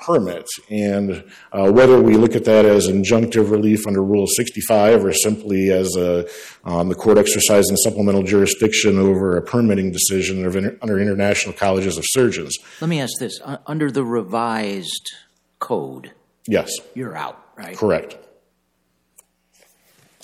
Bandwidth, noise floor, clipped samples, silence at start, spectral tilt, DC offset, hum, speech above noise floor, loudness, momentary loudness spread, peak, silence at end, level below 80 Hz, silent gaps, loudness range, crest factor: 15.5 kHz; -67 dBFS; under 0.1%; 0 s; -4.5 dB/octave; under 0.1%; none; 50 dB; -17 LUFS; 15 LU; -2 dBFS; 2.1 s; -52 dBFS; none; 11 LU; 14 dB